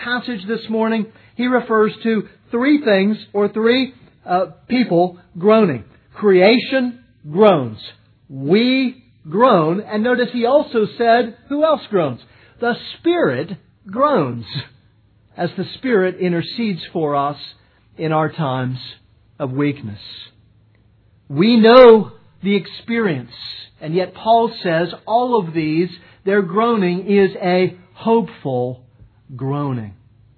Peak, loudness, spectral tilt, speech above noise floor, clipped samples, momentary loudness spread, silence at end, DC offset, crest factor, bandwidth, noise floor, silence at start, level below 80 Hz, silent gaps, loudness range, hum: 0 dBFS; -17 LUFS; -9.5 dB/octave; 38 dB; under 0.1%; 16 LU; 0.45 s; under 0.1%; 18 dB; 5.4 kHz; -54 dBFS; 0 s; -56 dBFS; none; 8 LU; none